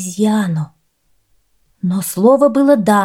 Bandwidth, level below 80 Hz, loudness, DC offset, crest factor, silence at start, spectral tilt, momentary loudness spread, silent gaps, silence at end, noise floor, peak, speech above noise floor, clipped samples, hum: 16.5 kHz; -62 dBFS; -14 LUFS; under 0.1%; 14 dB; 0 s; -6 dB/octave; 12 LU; none; 0 s; -62 dBFS; 0 dBFS; 49 dB; under 0.1%; none